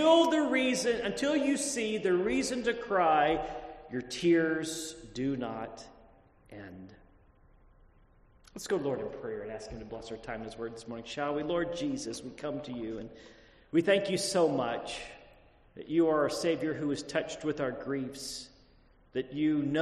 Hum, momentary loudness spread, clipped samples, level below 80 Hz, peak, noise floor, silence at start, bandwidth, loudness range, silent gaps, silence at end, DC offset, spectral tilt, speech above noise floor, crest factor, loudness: none; 16 LU; under 0.1%; -60 dBFS; -12 dBFS; -62 dBFS; 0 s; 13 kHz; 11 LU; none; 0 s; under 0.1%; -4.5 dB/octave; 31 dB; 20 dB; -31 LUFS